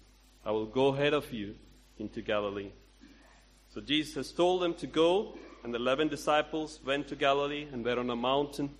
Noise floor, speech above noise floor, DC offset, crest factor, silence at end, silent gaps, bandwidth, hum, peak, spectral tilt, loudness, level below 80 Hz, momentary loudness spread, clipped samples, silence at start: -59 dBFS; 28 dB; under 0.1%; 20 dB; 0.05 s; none; 13 kHz; none; -12 dBFS; -5 dB/octave; -31 LUFS; -58 dBFS; 15 LU; under 0.1%; 0.45 s